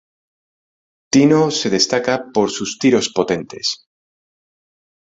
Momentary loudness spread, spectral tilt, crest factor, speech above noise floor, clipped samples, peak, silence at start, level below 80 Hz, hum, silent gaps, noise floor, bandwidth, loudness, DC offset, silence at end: 9 LU; -4 dB/octave; 18 dB; over 74 dB; under 0.1%; 0 dBFS; 1.15 s; -58 dBFS; none; none; under -90 dBFS; 8 kHz; -17 LUFS; under 0.1%; 1.4 s